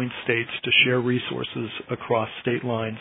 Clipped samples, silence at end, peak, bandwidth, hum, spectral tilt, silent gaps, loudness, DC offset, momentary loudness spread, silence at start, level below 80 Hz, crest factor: under 0.1%; 0 s; -6 dBFS; 4 kHz; none; -8.5 dB/octave; none; -23 LUFS; under 0.1%; 13 LU; 0 s; -64 dBFS; 20 dB